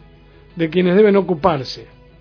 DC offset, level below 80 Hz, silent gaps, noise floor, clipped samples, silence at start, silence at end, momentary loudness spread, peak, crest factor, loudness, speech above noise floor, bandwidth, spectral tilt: under 0.1%; -46 dBFS; none; -45 dBFS; under 0.1%; 0.55 s; 0.35 s; 14 LU; 0 dBFS; 18 dB; -16 LUFS; 30 dB; 5.4 kHz; -8 dB/octave